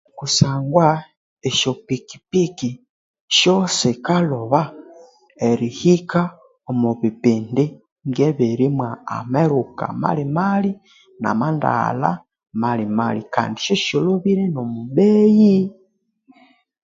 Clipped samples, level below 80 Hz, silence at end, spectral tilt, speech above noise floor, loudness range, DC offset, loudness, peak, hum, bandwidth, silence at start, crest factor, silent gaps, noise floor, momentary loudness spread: under 0.1%; -56 dBFS; 1.1 s; -5.5 dB/octave; 43 dB; 3 LU; under 0.1%; -19 LUFS; 0 dBFS; none; 7.8 kHz; 0.15 s; 18 dB; 1.17-1.37 s, 2.90-3.14 s, 3.21-3.28 s, 7.92-7.96 s; -61 dBFS; 11 LU